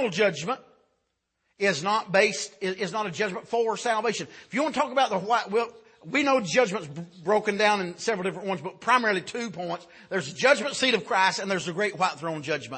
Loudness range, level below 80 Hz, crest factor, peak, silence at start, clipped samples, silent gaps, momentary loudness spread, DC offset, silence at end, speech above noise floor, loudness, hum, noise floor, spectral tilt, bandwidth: 2 LU; -74 dBFS; 22 dB; -6 dBFS; 0 s; under 0.1%; none; 10 LU; under 0.1%; 0 s; 51 dB; -26 LUFS; none; -77 dBFS; -3.5 dB/octave; 8.8 kHz